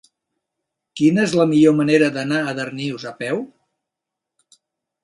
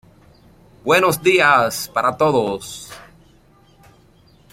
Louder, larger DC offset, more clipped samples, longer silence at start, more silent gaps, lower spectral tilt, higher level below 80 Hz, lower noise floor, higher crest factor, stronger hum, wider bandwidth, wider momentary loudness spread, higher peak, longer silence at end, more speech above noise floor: about the same, -18 LUFS vs -16 LUFS; neither; neither; about the same, 0.95 s vs 0.85 s; neither; first, -6 dB/octave vs -4 dB/octave; second, -64 dBFS vs -54 dBFS; first, -84 dBFS vs -52 dBFS; about the same, 18 dB vs 18 dB; neither; second, 11.5 kHz vs 16.5 kHz; second, 13 LU vs 18 LU; about the same, -2 dBFS vs -2 dBFS; about the same, 1.6 s vs 1.5 s; first, 66 dB vs 35 dB